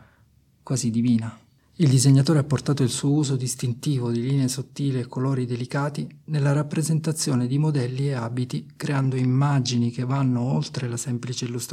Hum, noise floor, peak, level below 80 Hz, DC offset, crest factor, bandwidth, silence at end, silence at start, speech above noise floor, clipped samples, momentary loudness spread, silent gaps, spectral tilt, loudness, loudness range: none; -59 dBFS; -6 dBFS; -62 dBFS; under 0.1%; 16 dB; 14.5 kHz; 0 s; 0.65 s; 36 dB; under 0.1%; 8 LU; none; -6 dB/octave; -24 LUFS; 3 LU